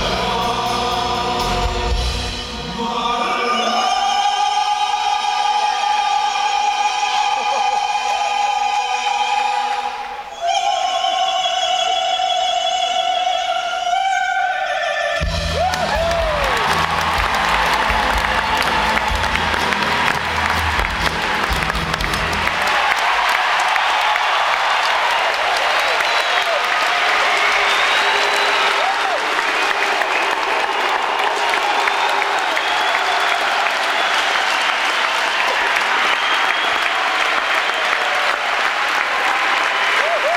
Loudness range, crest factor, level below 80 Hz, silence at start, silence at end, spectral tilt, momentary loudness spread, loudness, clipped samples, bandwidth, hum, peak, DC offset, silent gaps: 4 LU; 18 dB; -34 dBFS; 0 s; 0 s; -2 dB/octave; 4 LU; -17 LUFS; under 0.1%; 17 kHz; none; 0 dBFS; under 0.1%; none